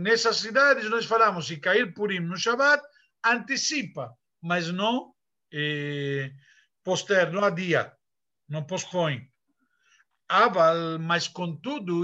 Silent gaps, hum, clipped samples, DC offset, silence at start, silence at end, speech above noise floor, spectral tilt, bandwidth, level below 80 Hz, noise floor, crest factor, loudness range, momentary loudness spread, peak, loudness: none; none; under 0.1%; under 0.1%; 0 s; 0 s; 64 dB; -4 dB/octave; 8.6 kHz; -76 dBFS; -89 dBFS; 18 dB; 6 LU; 15 LU; -8 dBFS; -25 LUFS